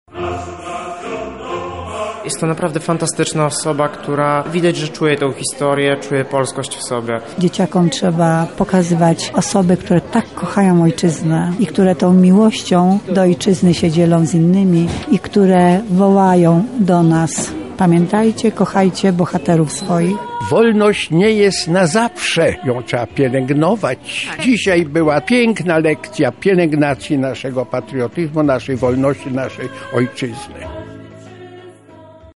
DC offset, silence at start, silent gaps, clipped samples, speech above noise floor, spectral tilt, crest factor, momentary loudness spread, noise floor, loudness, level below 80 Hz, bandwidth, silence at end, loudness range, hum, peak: 0.3%; 0.15 s; none; under 0.1%; 26 dB; -6 dB/octave; 12 dB; 11 LU; -40 dBFS; -15 LUFS; -46 dBFS; 11.5 kHz; 0.1 s; 6 LU; none; -2 dBFS